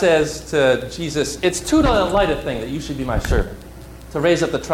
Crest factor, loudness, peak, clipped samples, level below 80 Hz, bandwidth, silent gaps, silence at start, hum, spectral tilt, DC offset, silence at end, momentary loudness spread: 12 dB; -19 LUFS; -6 dBFS; under 0.1%; -30 dBFS; 16.5 kHz; none; 0 s; none; -5 dB/octave; under 0.1%; 0 s; 12 LU